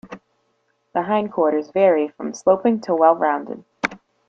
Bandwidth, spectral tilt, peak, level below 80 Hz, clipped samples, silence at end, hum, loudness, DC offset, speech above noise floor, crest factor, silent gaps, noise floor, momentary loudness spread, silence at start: 7.8 kHz; -6 dB/octave; -2 dBFS; -66 dBFS; under 0.1%; 0.3 s; none; -20 LUFS; under 0.1%; 49 dB; 18 dB; none; -68 dBFS; 10 LU; 0.05 s